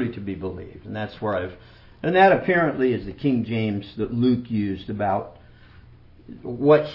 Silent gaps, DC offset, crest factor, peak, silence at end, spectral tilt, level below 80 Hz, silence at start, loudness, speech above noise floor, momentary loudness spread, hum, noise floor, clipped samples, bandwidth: none; under 0.1%; 20 dB; -2 dBFS; 0 s; -9.5 dB/octave; -52 dBFS; 0 s; -23 LUFS; 26 dB; 17 LU; 60 Hz at -50 dBFS; -48 dBFS; under 0.1%; 5.8 kHz